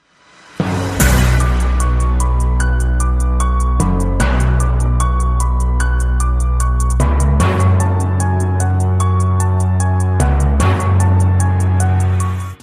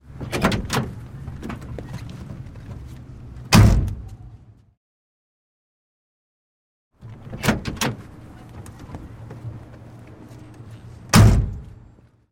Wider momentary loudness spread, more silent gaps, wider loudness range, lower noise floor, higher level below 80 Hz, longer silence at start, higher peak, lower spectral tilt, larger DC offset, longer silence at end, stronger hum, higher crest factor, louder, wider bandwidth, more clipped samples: second, 3 LU vs 28 LU; second, none vs 4.77-6.91 s; second, 2 LU vs 10 LU; second, -46 dBFS vs -50 dBFS; first, -16 dBFS vs -32 dBFS; first, 0.6 s vs 0.1 s; about the same, -2 dBFS vs -2 dBFS; about the same, -6 dB/octave vs -5.5 dB/octave; neither; second, 0.05 s vs 0.65 s; neither; second, 12 dB vs 22 dB; first, -15 LUFS vs -20 LUFS; about the same, 15 kHz vs 16.5 kHz; neither